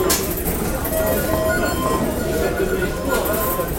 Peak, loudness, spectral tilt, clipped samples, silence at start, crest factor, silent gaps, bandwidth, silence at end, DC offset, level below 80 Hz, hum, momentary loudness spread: -4 dBFS; -20 LUFS; -4.5 dB/octave; under 0.1%; 0 s; 16 dB; none; 17 kHz; 0 s; under 0.1%; -30 dBFS; none; 3 LU